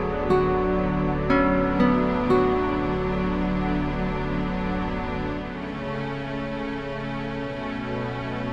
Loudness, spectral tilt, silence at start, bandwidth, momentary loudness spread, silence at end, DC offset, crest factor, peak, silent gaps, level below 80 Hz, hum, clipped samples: -25 LUFS; -8.5 dB/octave; 0 s; 7.8 kHz; 9 LU; 0 s; under 0.1%; 16 dB; -8 dBFS; none; -36 dBFS; none; under 0.1%